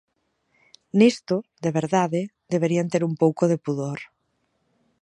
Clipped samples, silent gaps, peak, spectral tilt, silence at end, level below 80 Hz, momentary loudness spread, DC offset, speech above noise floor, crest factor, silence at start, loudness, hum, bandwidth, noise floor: under 0.1%; none; -4 dBFS; -6.5 dB/octave; 1 s; -70 dBFS; 10 LU; under 0.1%; 50 dB; 20 dB; 0.95 s; -23 LUFS; none; 10.5 kHz; -72 dBFS